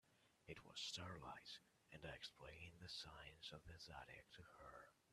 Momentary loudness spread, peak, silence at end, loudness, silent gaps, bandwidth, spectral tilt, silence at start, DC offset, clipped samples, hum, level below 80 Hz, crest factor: 12 LU; -38 dBFS; 0 s; -57 LUFS; none; 13.5 kHz; -3 dB/octave; 0.05 s; under 0.1%; under 0.1%; none; -74 dBFS; 20 dB